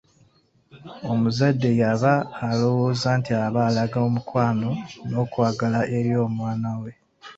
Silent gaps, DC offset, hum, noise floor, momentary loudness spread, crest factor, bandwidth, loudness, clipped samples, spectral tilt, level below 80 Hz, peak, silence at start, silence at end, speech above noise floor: none; under 0.1%; none; -60 dBFS; 9 LU; 18 dB; 7.8 kHz; -23 LUFS; under 0.1%; -7.5 dB/octave; -56 dBFS; -4 dBFS; 0.75 s; 0.05 s; 38 dB